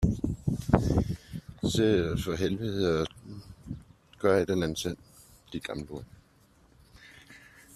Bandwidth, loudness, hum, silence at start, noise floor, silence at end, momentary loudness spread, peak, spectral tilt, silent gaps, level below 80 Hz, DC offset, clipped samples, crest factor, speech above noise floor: 13.5 kHz; -29 LUFS; none; 0 s; -62 dBFS; 0.4 s; 19 LU; -4 dBFS; -6 dB/octave; none; -44 dBFS; under 0.1%; under 0.1%; 26 dB; 33 dB